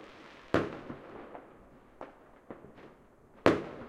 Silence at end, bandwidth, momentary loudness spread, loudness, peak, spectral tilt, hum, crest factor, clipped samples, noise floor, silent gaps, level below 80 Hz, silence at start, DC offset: 0 s; 13 kHz; 25 LU; -32 LUFS; -2 dBFS; -6.5 dB/octave; none; 34 dB; under 0.1%; -59 dBFS; none; -62 dBFS; 0 s; under 0.1%